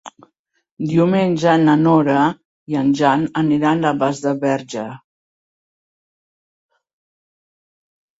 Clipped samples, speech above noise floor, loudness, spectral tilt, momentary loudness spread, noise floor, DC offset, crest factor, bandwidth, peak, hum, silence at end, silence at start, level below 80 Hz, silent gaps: under 0.1%; 50 dB; -17 LUFS; -7 dB/octave; 13 LU; -66 dBFS; under 0.1%; 18 dB; 8 kHz; -2 dBFS; none; 3.2 s; 0.05 s; -60 dBFS; 0.39-0.45 s, 0.71-0.77 s, 2.45-2.66 s